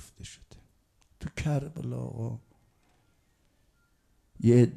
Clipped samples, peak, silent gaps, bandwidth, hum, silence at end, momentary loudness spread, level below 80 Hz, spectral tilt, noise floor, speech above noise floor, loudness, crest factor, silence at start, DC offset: under 0.1%; -10 dBFS; none; 11.5 kHz; none; 0 s; 23 LU; -56 dBFS; -8 dB/octave; -68 dBFS; 43 dB; -30 LUFS; 22 dB; 0 s; under 0.1%